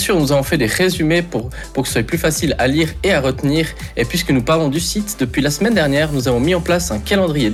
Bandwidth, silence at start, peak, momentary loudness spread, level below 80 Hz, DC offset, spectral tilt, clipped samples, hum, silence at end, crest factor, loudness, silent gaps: 16 kHz; 0 s; -4 dBFS; 5 LU; -32 dBFS; under 0.1%; -5 dB/octave; under 0.1%; none; 0 s; 12 dB; -16 LUFS; none